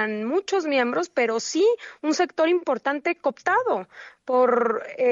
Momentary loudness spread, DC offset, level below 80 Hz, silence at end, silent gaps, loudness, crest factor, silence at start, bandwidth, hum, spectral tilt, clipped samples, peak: 6 LU; under 0.1%; -78 dBFS; 0 s; none; -23 LUFS; 14 dB; 0 s; 7.8 kHz; none; -3.5 dB/octave; under 0.1%; -8 dBFS